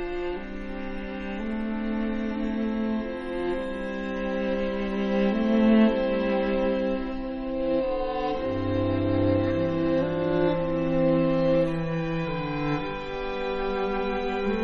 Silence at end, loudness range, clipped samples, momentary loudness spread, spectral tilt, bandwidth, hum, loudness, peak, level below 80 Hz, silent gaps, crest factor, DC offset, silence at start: 0 s; 5 LU; under 0.1%; 9 LU; -8.5 dB/octave; 6.6 kHz; none; -27 LUFS; -8 dBFS; -42 dBFS; none; 18 dB; under 0.1%; 0 s